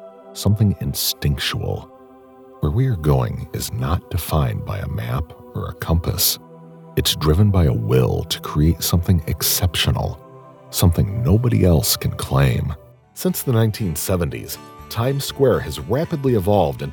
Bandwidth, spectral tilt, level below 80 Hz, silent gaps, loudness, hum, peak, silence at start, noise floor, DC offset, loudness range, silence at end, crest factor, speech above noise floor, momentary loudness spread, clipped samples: 20 kHz; -5 dB/octave; -32 dBFS; none; -20 LUFS; none; -2 dBFS; 0 s; -44 dBFS; under 0.1%; 4 LU; 0 s; 18 dB; 26 dB; 11 LU; under 0.1%